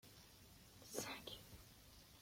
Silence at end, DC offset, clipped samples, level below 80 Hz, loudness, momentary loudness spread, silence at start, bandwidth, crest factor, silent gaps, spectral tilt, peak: 0 s; under 0.1%; under 0.1%; -72 dBFS; -54 LUFS; 15 LU; 0.05 s; 16.5 kHz; 26 dB; none; -2.5 dB/octave; -30 dBFS